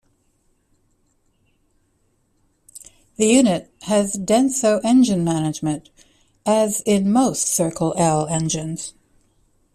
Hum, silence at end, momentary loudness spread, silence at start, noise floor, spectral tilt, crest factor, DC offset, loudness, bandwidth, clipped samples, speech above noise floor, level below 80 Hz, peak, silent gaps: none; 0.85 s; 13 LU; 2.75 s; -65 dBFS; -5 dB/octave; 18 dB; under 0.1%; -19 LUFS; 14 kHz; under 0.1%; 46 dB; -56 dBFS; -4 dBFS; none